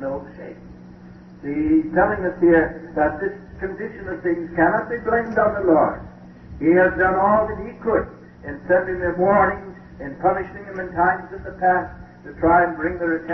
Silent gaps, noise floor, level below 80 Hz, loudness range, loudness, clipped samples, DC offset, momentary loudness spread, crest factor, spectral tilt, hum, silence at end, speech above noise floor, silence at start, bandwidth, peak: none; -42 dBFS; -42 dBFS; 3 LU; -20 LUFS; under 0.1%; under 0.1%; 19 LU; 16 dB; -10 dB/octave; none; 0 s; 22 dB; 0 s; 5.8 kHz; -4 dBFS